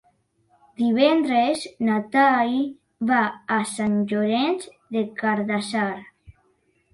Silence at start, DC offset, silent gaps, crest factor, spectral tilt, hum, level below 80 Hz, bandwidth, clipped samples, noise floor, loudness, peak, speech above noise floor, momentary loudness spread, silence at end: 0.8 s; under 0.1%; none; 18 dB; -5 dB/octave; none; -64 dBFS; 11.5 kHz; under 0.1%; -66 dBFS; -22 LUFS; -6 dBFS; 44 dB; 10 LU; 0.65 s